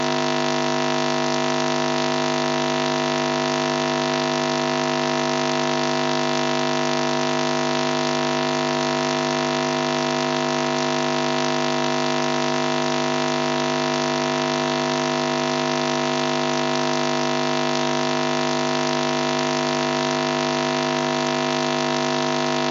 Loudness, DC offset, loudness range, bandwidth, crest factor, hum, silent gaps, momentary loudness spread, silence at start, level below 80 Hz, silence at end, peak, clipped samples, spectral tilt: -21 LUFS; under 0.1%; 0 LU; 8 kHz; 20 dB; 50 Hz at -35 dBFS; none; 0 LU; 0 s; -70 dBFS; 0 s; -2 dBFS; under 0.1%; -3.5 dB/octave